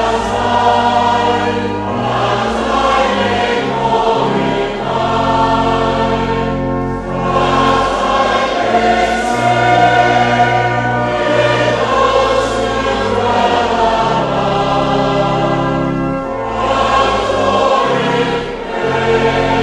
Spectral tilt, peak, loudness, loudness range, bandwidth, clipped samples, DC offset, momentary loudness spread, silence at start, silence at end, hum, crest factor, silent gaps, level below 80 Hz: -5.5 dB/octave; 0 dBFS; -13 LUFS; 2 LU; 11.5 kHz; under 0.1%; under 0.1%; 5 LU; 0 s; 0 s; none; 14 dB; none; -32 dBFS